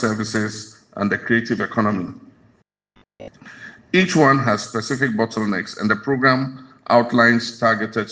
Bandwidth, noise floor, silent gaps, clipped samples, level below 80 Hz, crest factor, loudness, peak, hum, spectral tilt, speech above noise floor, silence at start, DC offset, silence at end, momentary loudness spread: 9.6 kHz; -60 dBFS; none; under 0.1%; -60 dBFS; 20 dB; -19 LUFS; -2 dBFS; none; -5.5 dB/octave; 41 dB; 0 s; under 0.1%; 0 s; 19 LU